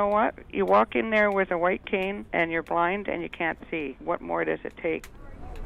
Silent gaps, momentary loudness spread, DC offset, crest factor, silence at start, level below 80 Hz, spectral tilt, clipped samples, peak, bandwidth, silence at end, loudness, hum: none; 10 LU; under 0.1%; 18 dB; 0 s; -48 dBFS; -6.5 dB/octave; under 0.1%; -8 dBFS; 13.5 kHz; 0 s; -26 LUFS; none